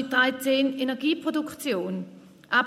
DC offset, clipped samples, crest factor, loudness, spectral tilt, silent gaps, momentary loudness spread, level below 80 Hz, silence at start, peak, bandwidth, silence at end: under 0.1%; under 0.1%; 18 dB; -26 LUFS; -4 dB/octave; none; 10 LU; -76 dBFS; 0 s; -8 dBFS; 16 kHz; 0 s